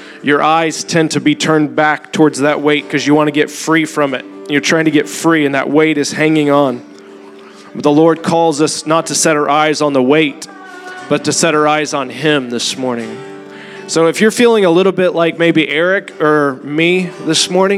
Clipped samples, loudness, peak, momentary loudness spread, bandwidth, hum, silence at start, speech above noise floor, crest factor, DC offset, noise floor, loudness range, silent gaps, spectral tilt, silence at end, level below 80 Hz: under 0.1%; -12 LUFS; 0 dBFS; 8 LU; 14.5 kHz; none; 0 s; 23 dB; 12 dB; under 0.1%; -35 dBFS; 2 LU; none; -4 dB/octave; 0 s; -66 dBFS